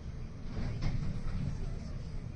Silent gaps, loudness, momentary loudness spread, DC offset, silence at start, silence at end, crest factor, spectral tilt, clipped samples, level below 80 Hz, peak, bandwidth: none; -40 LUFS; 6 LU; under 0.1%; 0 s; 0 s; 16 dB; -7.5 dB/octave; under 0.1%; -40 dBFS; -20 dBFS; 8.4 kHz